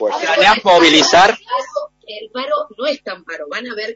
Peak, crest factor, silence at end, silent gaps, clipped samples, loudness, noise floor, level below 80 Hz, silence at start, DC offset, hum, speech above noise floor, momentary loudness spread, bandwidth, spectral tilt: 0 dBFS; 14 dB; 0 s; none; under 0.1%; -12 LUFS; -33 dBFS; -52 dBFS; 0 s; under 0.1%; none; 21 dB; 19 LU; 8 kHz; 0 dB/octave